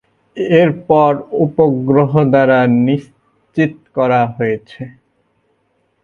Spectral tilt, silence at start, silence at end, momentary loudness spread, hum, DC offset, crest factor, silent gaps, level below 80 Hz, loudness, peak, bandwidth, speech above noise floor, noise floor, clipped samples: -9 dB/octave; 0.35 s; 1.15 s; 13 LU; none; under 0.1%; 14 dB; none; -54 dBFS; -14 LUFS; 0 dBFS; 7 kHz; 50 dB; -62 dBFS; under 0.1%